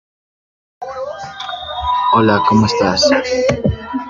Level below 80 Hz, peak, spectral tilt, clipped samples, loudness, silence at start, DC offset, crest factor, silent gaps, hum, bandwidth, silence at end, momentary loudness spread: -38 dBFS; 0 dBFS; -5 dB/octave; under 0.1%; -14 LUFS; 0.8 s; under 0.1%; 16 dB; none; none; 7.6 kHz; 0 s; 14 LU